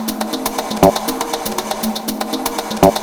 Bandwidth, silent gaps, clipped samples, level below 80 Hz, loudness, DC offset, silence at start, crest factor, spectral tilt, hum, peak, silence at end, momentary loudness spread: over 20 kHz; none; under 0.1%; -38 dBFS; -18 LUFS; under 0.1%; 0 s; 16 dB; -4 dB/octave; none; 0 dBFS; 0 s; 7 LU